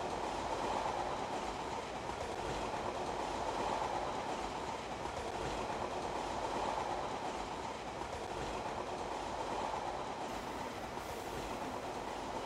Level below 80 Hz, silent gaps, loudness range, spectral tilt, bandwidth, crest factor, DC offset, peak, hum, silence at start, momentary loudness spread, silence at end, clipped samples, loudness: -56 dBFS; none; 2 LU; -4 dB/octave; 16 kHz; 16 dB; under 0.1%; -24 dBFS; none; 0 s; 5 LU; 0 s; under 0.1%; -40 LUFS